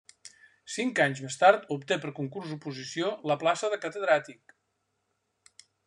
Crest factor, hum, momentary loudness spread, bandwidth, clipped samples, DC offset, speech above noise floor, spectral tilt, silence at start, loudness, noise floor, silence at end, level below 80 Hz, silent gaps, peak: 24 dB; none; 15 LU; 11 kHz; under 0.1%; under 0.1%; 50 dB; -4 dB/octave; 0.25 s; -28 LUFS; -78 dBFS; 1.55 s; -80 dBFS; none; -6 dBFS